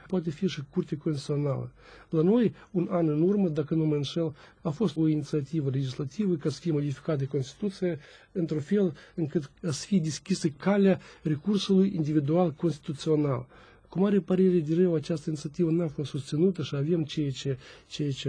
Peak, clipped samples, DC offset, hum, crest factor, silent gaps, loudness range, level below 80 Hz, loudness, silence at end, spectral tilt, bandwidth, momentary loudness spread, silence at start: -12 dBFS; under 0.1%; under 0.1%; none; 16 dB; none; 4 LU; -62 dBFS; -28 LUFS; 0 s; -7 dB/octave; 10 kHz; 10 LU; 0.1 s